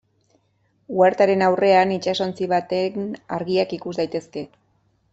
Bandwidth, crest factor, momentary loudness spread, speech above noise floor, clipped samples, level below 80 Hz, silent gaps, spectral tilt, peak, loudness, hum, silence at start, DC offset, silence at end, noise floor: 8 kHz; 18 dB; 13 LU; 45 dB; under 0.1%; -64 dBFS; none; -6 dB/octave; -4 dBFS; -21 LUFS; none; 0.9 s; under 0.1%; 0.65 s; -65 dBFS